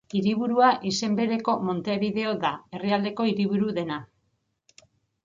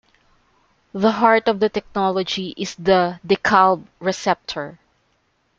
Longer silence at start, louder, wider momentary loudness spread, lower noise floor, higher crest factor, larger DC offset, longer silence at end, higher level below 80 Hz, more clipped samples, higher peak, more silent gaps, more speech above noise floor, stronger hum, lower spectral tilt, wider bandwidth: second, 0.15 s vs 0.95 s; second, -25 LUFS vs -19 LUFS; second, 9 LU vs 13 LU; first, -74 dBFS vs -65 dBFS; about the same, 20 dB vs 18 dB; neither; first, 1.2 s vs 0.9 s; second, -66 dBFS vs -54 dBFS; neither; second, -6 dBFS vs -2 dBFS; neither; about the same, 49 dB vs 47 dB; neither; about the same, -5.5 dB/octave vs -5 dB/octave; about the same, 7.6 kHz vs 7.8 kHz